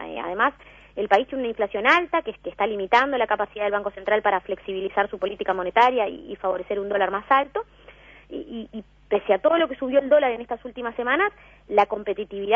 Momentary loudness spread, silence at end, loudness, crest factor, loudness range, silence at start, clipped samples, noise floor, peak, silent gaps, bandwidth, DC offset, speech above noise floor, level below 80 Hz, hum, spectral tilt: 14 LU; 0 s; -23 LUFS; 22 dB; 2 LU; 0 s; under 0.1%; -49 dBFS; -2 dBFS; none; 7.6 kHz; under 0.1%; 25 dB; -56 dBFS; none; -5 dB/octave